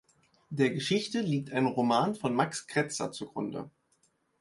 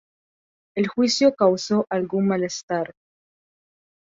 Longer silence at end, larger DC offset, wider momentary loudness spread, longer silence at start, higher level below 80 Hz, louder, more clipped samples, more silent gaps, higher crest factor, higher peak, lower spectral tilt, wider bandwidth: second, 0.7 s vs 1.15 s; neither; about the same, 10 LU vs 10 LU; second, 0.5 s vs 0.75 s; about the same, -70 dBFS vs -66 dBFS; second, -30 LUFS vs -22 LUFS; neither; second, none vs 2.63-2.68 s; about the same, 20 dB vs 18 dB; second, -10 dBFS vs -4 dBFS; about the same, -5 dB/octave vs -5 dB/octave; first, 11.5 kHz vs 7.8 kHz